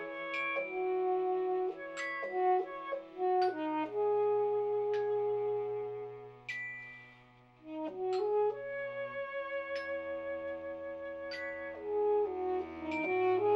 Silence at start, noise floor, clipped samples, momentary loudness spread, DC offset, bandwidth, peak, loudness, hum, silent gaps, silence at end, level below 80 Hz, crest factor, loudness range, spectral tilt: 0 s; -60 dBFS; under 0.1%; 11 LU; under 0.1%; 8 kHz; -20 dBFS; -35 LUFS; none; none; 0 s; -72 dBFS; 14 dB; 5 LU; -6 dB/octave